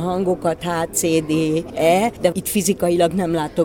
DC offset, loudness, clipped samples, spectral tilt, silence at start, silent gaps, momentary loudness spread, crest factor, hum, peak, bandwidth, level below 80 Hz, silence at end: under 0.1%; -19 LUFS; under 0.1%; -5 dB/octave; 0 s; none; 4 LU; 16 dB; none; -2 dBFS; 18 kHz; -46 dBFS; 0 s